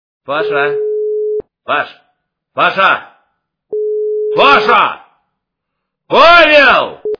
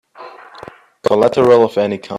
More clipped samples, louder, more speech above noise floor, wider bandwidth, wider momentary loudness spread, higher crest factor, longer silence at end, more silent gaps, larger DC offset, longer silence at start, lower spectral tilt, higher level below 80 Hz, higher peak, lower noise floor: first, 0.6% vs under 0.1%; first, -10 LUFS vs -13 LUFS; first, 65 dB vs 25 dB; second, 5.4 kHz vs 11.5 kHz; first, 15 LU vs 11 LU; about the same, 12 dB vs 16 dB; about the same, 0.05 s vs 0 s; neither; neither; about the same, 0.3 s vs 0.2 s; second, -4 dB/octave vs -6.5 dB/octave; first, -46 dBFS vs -56 dBFS; about the same, 0 dBFS vs 0 dBFS; first, -74 dBFS vs -38 dBFS